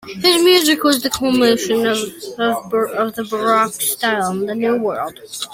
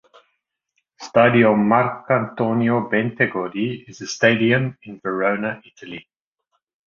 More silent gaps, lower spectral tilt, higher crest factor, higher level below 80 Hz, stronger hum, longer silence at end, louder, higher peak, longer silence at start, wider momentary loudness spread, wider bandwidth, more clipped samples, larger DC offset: neither; second, -3 dB/octave vs -6 dB/octave; about the same, 16 dB vs 18 dB; about the same, -56 dBFS vs -60 dBFS; neither; second, 0 s vs 0.85 s; first, -16 LUFS vs -19 LUFS; about the same, 0 dBFS vs -2 dBFS; second, 0.05 s vs 1 s; second, 10 LU vs 19 LU; first, 16.5 kHz vs 7.4 kHz; neither; neither